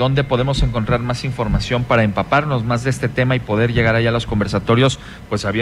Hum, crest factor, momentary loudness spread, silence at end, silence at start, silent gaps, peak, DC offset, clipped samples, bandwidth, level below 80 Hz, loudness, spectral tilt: none; 14 dB; 5 LU; 0 s; 0 s; none; -4 dBFS; under 0.1%; under 0.1%; 11.5 kHz; -30 dBFS; -18 LUFS; -6.5 dB/octave